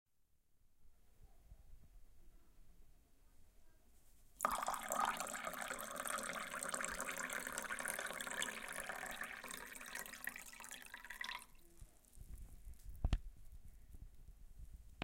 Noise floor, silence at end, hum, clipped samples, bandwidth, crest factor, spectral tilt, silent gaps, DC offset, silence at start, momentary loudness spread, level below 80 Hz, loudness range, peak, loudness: -76 dBFS; 0 s; none; under 0.1%; 17 kHz; 30 dB; -2 dB/octave; none; under 0.1%; 0.5 s; 22 LU; -56 dBFS; 9 LU; -18 dBFS; -44 LUFS